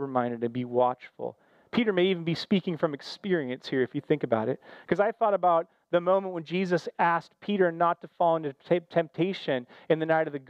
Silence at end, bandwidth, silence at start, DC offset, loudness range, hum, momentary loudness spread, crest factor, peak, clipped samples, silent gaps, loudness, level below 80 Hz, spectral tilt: 0.1 s; 8.6 kHz; 0 s; under 0.1%; 2 LU; none; 7 LU; 16 dB; -10 dBFS; under 0.1%; none; -28 LUFS; -72 dBFS; -7 dB/octave